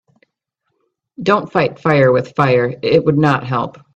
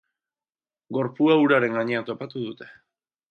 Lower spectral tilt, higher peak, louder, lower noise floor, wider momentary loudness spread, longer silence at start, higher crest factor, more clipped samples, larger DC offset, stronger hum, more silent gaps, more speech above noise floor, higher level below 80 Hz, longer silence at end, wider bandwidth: about the same, -8 dB/octave vs -8 dB/octave; first, 0 dBFS vs -6 dBFS; first, -15 LUFS vs -23 LUFS; second, -73 dBFS vs under -90 dBFS; second, 6 LU vs 15 LU; first, 1.2 s vs 0.9 s; about the same, 16 dB vs 18 dB; neither; neither; neither; neither; second, 58 dB vs over 67 dB; first, -54 dBFS vs -74 dBFS; second, 0.25 s vs 0.6 s; first, 8.2 kHz vs 6.2 kHz